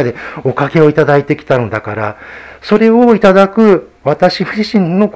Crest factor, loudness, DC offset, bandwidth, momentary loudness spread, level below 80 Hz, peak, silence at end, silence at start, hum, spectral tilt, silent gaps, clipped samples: 10 dB; -11 LUFS; under 0.1%; 8 kHz; 12 LU; -46 dBFS; 0 dBFS; 0.05 s; 0 s; none; -7.5 dB/octave; none; 0.8%